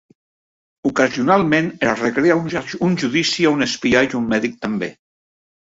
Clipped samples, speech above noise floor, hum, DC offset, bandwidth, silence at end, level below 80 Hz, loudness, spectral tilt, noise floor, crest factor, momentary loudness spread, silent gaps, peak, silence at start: under 0.1%; over 72 dB; none; under 0.1%; 8 kHz; 0.85 s; -54 dBFS; -18 LUFS; -5 dB/octave; under -90 dBFS; 18 dB; 9 LU; none; -2 dBFS; 0.85 s